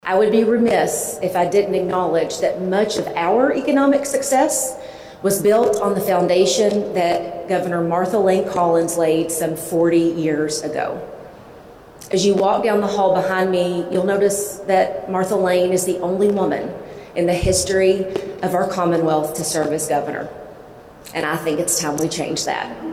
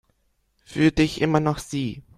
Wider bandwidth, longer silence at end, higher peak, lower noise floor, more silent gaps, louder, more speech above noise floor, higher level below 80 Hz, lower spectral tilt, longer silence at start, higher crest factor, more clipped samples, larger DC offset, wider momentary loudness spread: first, 16 kHz vs 13.5 kHz; second, 0 s vs 0.15 s; about the same, -4 dBFS vs -4 dBFS; second, -41 dBFS vs -68 dBFS; neither; first, -18 LUFS vs -22 LUFS; second, 23 dB vs 46 dB; about the same, -46 dBFS vs -44 dBFS; second, -4.5 dB/octave vs -6 dB/octave; second, 0.05 s vs 0.7 s; second, 14 dB vs 20 dB; neither; neither; about the same, 8 LU vs 9 LU